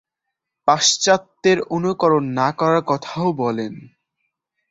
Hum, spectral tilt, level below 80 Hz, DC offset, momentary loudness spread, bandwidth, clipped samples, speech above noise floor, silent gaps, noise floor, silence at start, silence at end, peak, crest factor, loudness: none; -3.5 dB/octave; -62 dBFS; under 0.1%; 8 LU; 8 kHz; under 0.1%; 63 dB; none; -81 dBFS; 0.65 s; 0.85 s; -2 dBFS; 18 dB; -18 LUFS